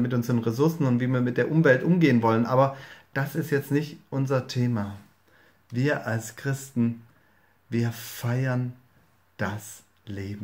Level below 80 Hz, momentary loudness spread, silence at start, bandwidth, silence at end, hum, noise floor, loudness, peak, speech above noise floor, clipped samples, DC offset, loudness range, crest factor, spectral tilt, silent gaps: -68 dBFS; 16 LU; 0 s; 16 kHz; 0 s; none; -63 dBFS; -26 LUFS; -6 dBFS; 38 dB; under 0.1%; under 0.1%; 8 LU; 20 dB; -7 dB/octave; none